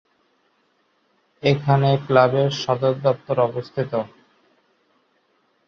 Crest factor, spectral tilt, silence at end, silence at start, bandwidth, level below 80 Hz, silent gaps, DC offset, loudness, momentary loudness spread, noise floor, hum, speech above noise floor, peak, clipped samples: 20 dB; -7 dB/octave; 1.6 s; 1.45 s; 6.8 kHz; -60 dBFS; none; under 0.1%; -20 LUFS; 9 LU; -65 dBFS; none; 46 dB; -2 dBFS; under 0.1%